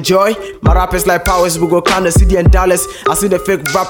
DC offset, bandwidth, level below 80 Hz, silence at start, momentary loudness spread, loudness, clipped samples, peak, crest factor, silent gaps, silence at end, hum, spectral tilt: under 0.1%; 17.5 kHz; -18 dBFS; 0 s; 4 LU; -12 LUFS; under 0.1%; 0 dBFS; 10 dB; none; 0 s; none; -5 dB/octave